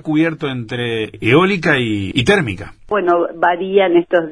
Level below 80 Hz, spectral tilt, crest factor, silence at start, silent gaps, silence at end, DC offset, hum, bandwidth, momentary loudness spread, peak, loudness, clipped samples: -46 dBFS; -6 dB/octave; 16 dB; 0.05 s; none; 0 s; 0.2%; none; 10.5 kHz; 9 LU; 0 dBFS; -16 LUFS; under 0.1%